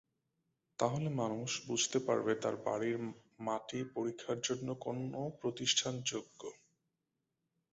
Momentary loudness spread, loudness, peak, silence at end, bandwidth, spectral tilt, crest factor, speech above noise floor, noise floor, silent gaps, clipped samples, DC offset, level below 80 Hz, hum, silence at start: 12 LU; -37 LUFS; -16 dBFS; 1.2 s; 8 kHz; -4 dB/octave; 22 dB; 49 dB; -87 dBFS; none; under 0.1%; under 0.1%; -76 dBFS; none; 0.8 s